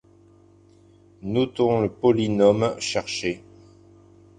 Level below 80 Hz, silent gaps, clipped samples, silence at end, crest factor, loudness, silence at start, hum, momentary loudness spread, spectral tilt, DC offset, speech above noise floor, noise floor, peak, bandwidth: -54 dBFS; none; under 0.1%; 1 s; 20 dB; -22 LUFS; 1.25 s; none; 10 LU; -5.5 dB/octave; under 0.1%; 32 dB; -54 dBFS; -4 dBFS; 10 kHz